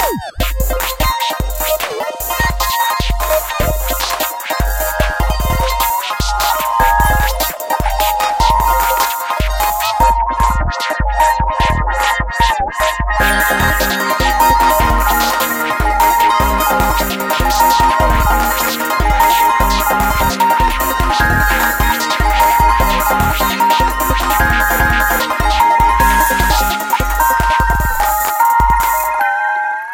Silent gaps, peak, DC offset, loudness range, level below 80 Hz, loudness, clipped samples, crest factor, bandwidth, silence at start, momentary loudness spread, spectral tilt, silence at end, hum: none; 0 dBFS; under 0.1%; 4 LU; -20 dBFS; -13 LUFS; under 0.1%; 14 dB; 17.5 kHz; 0 s; 6 LU; -3.5 dB/octave; 0 s; none